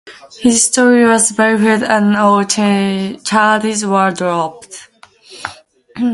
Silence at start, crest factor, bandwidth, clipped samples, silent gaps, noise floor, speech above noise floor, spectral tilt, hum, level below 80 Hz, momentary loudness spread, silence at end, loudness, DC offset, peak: 0.05 s; 14 dB; 11.5 kHz; under 0.1%; none; -40 dBFS; 27 dB; -3.5 dB/octave; none; -56 dBFS; 19 LU; 0 s; -12 LUFS; under 0.1%; 0 dBFS